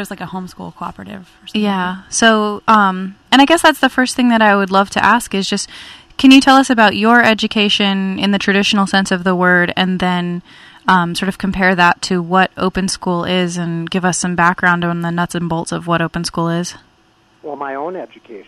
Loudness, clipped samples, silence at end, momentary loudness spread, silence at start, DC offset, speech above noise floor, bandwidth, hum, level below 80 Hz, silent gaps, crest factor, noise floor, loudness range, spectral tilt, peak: -13 LUFS; under 0.1%; 0.05 s; 17 LU; 0 s; under 0.1%; 39 dB; 14 kHz; none; -46 dBFS; none; 14 dB; -53 dBFS; 5 LU; -4.5 dB/octave; 0 dBFS